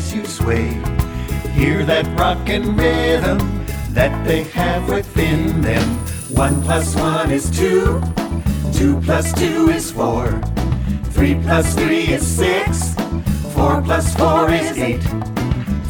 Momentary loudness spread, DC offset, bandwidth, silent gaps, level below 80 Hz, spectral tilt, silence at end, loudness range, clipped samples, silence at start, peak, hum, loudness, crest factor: 6 LU; under 0.1%; over 20 kHz; none; -24 dBFS; -5.5 dB/octave; 0 s; 1 LU; under 0.1%; 0 s; 0 dBFS; none; -17 LUFS; 16 dB